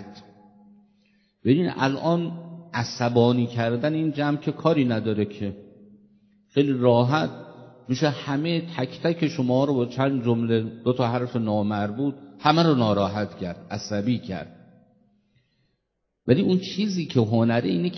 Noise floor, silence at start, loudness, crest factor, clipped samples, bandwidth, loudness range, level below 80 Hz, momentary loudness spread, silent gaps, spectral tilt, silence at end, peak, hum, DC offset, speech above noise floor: -77 dBFS; 0 s; -24 LUFS; 22 dB; under 0.1%; 6.4 kHz; 4 LU; -58 dBFS; 12 LU; none; -7 dB/octave; 0 s; -4 dBFS; none; under 0.1%; 55 dB